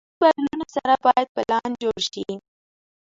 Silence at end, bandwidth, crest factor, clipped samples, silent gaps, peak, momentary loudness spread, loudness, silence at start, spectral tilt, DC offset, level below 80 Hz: 0.65 s; 7.8 kHz; 20 dB; under 0.1%; 1.29-1.35 s; -4 dBFS; 12 LU; -22 LUFS; 0.2 s; -3.5 dB/octave; under 0.1%; -62 dBFS